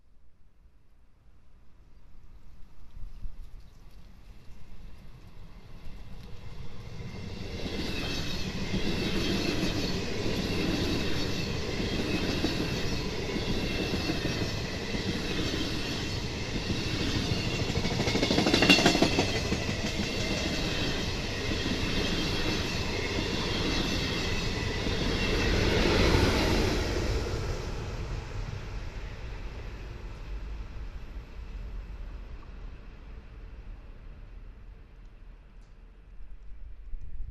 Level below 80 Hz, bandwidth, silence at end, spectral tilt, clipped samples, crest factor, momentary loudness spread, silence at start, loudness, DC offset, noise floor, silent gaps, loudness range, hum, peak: -38 dBFS; 14 kHz; 0 s; -4.5 dB/octave; under 0.1%; 26 dB; 23 LU; 0.05 s; -29 LUFS; under 0.1%; -55 dBFS; none; 22 LU; none; -6 dBFS